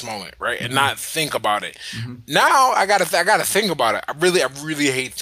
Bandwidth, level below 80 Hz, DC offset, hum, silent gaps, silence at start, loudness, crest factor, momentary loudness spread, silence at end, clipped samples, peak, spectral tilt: 16 kHz; -58 dBFS; under 0.1%; none; none; 0 s; -18 LUFS; 18 dB; 12 LU; 0 s; under 0.1%; -2 dBFS; -2.5 dB/octave